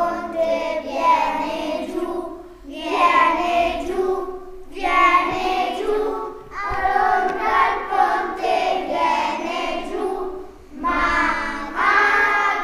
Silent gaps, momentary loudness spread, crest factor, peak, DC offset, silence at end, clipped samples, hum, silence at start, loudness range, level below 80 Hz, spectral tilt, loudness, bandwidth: none; 14 LU; 16 dB; -4 dBFS; under 0.1%; 0 s; under 0.1%; none; 0 s; 3 LU; -42 dBFS; -3.5 dB/octave; -20 LUFS; 15.5 kHz